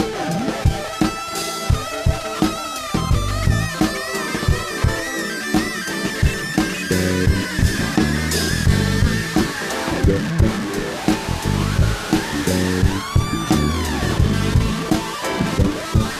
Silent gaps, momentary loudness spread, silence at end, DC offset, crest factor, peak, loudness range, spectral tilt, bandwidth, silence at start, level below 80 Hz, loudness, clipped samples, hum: none; 5 LU; 0 s; under 0.1%; 16 dB; -2 dBFS; 2 LU; -5 dB/octave; 15 kHz; 0 s; -26 dBFS; -20 LUFS; under 0.1%; none